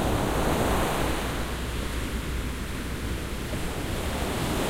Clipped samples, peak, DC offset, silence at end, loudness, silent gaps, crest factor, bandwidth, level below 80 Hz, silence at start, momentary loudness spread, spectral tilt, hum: under 0.1%; -12 dBFS; under 0.1%; 0 s; -29 LUFS; none; 16 dB; 16 kHz; -34 dBFS; 0 s; 7 LU; -5 dB/octave; none